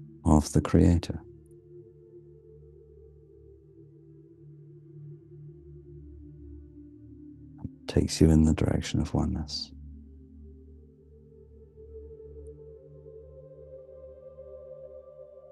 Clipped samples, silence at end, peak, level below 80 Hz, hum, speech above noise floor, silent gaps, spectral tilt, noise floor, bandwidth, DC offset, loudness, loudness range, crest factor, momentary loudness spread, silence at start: under 0.1%; 0.25 s; -6 dBFS; -42 dBFS; none; 30 dB; none; -6.5 dB/octave; -54 dBFS; 12.5 kHz; under 0.1%; -26 LUFS; 23 LU; 26 dB; 28 LU; 0 s